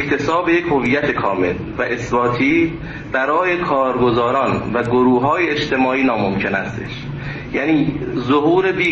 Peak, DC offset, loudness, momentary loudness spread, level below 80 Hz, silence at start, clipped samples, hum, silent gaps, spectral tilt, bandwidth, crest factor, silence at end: -4 dBFS; under 0.1%; -17 LUFS; 8 LU; -42 dBFS; 0 s; under 0.1%; none; none; -6.5 dB/octave; 8 kHz; 14 dB; 0 s